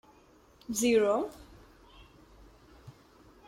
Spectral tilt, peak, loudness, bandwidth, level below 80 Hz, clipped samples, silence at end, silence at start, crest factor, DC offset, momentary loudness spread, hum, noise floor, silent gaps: -3.5 dB/octave; -14 dBFS; -29 LUFS; 16.5 kHz; -60 dBFS; under 0.1%; 0.55 s; 0.7 s; 20 dB; under 0.1%; 26 LU; none; -60 dBFS; none